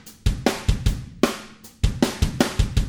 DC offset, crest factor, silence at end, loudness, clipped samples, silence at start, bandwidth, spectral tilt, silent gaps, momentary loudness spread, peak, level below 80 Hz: under 0.1%; 20 dB; 0 s; -24 LUFS; under 0.1%; 0.05 s; over 20 kHz; -5.5 dB/octave; none; 5 LU; -2 dBFS; -26 dBFS